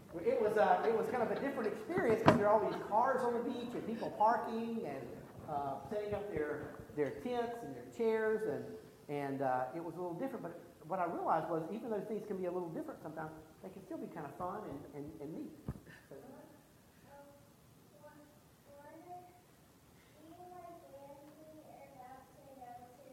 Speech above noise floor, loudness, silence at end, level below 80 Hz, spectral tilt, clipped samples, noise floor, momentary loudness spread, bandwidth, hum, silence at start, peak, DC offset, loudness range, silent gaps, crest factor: 27 dB; -37 LUFS; 0 s; -68 dBFS; -7 dB/octave; under 0.1%; -64 dBFS; 23 LU; 16.5 kHz; none; 0 s; -6 dBFS; under 0.1%; 23 LU; none; 32 dB